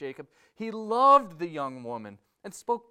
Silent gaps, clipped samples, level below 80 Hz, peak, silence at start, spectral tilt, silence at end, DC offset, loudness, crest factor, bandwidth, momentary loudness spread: none; under 0.1%; -76 dBFS; -8 dBFS; 0 s; -5 dB/octave; 0.1 s; under 0.1%; -25 LUFS; 20 dB; 14.5 kHz; 26 LU